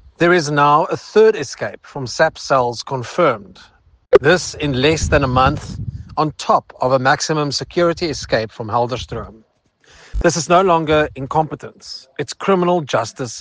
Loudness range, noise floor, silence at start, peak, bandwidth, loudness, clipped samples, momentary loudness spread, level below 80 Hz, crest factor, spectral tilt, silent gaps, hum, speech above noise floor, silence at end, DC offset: 3 LU; -54 dBFS; 0.2 s; 0 dBFS; 10 kHz; -17 LUFS; under 0.1%; 14 LU; -36 dBFS; 18 dB; -5 dB/octave; none; none; 37 dB; 0 s; under 0.1%